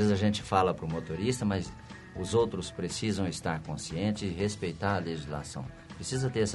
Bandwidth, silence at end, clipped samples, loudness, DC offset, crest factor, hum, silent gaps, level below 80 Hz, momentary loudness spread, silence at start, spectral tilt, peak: 11.5 kHz; 0 s; under 0.1%; -32 LUFS; under 0.1%; 20 dB; none; none; -52 dBFS; 13 LU; 0 s; -5.5 dB/octave; -10 dBFS